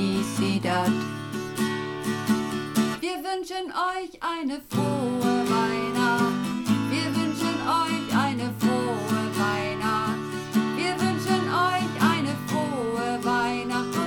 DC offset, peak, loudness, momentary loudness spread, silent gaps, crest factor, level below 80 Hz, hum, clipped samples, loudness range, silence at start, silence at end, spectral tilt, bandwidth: under 0.1%; -10 dBFS; -26 LUFS; 6 LU; none; 16 dB; -58 dBFS; none; under 0.1%; 3 LU; 0 s; 0 s; -5 dB/octave; 19 kHz